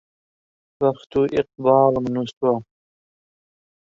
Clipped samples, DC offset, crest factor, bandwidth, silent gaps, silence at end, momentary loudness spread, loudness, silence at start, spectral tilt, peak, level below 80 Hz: under 0.1%; under 0.1%; 20 dB; 7.4 kHz; 2.33-2.41 s; 1.2 s; 7 LU; -21 LUFS; 0.8 s; -8 dB/octave; -2 dBFS; -56 dBFS